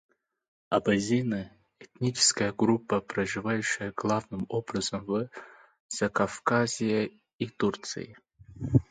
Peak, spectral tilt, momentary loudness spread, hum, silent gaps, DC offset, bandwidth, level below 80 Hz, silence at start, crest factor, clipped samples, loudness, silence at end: -8 dBFS; -4.5 dB/octave; 12 LU; none; 5.80-5.89 s, 7.34-7.39 s; under 0.1%; 9.6 kHz; -56 dBFS; 0.7 s; 22 dB; under 0.1%; -29 LUFS; 0.1 s